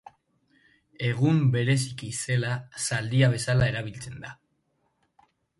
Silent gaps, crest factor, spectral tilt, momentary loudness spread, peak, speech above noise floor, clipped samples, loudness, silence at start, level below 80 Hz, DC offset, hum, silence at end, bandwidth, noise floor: none; 18 dB; -5.5 dB/octave; 16 LU; -10 dBFS; 47 dB; under 0.1%; -26 LUFS; 1 s; -54 dBFS; under 0.1%; none; 1.25 s; 11.5 kHz; -73 dBFS